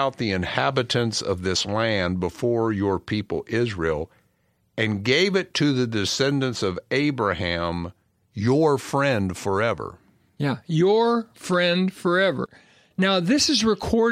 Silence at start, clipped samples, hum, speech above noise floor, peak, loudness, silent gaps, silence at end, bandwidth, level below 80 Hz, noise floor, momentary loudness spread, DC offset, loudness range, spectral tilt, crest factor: 0 s; under 0.1%; none; 44 dB; -4 dBFS; -23 LUFS; none; 0 s; 15 kHz; -50 dBFS; -67 dBFS; 8 LU; under 0.1%; 3 LU; -5 dB/octave; 20 dB